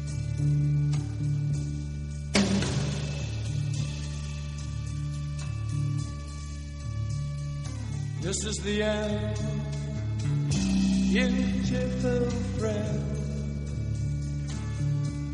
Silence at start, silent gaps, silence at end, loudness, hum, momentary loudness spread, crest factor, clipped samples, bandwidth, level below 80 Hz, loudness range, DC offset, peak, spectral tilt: 0 s; none; 0 s; -30 LUFS; none; 9 LU; 18 dB; under 0.1%; 11 kHz; -38 dBFS; 6 LU; under 0.1%; -10 dBFS; -6 dB/octave